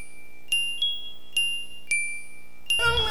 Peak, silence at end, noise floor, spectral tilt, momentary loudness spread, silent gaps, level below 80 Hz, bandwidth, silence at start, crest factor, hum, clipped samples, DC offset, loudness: -10 dBFS; 0 s; -49 dBFS; -0.5 dB/octave; 14 LU; none; -46 dBFS; 19.5 kHz; 0 s; 18 dB; 60 Hz at -60 dBFS; under 0.1%; 3%; -25 LUFS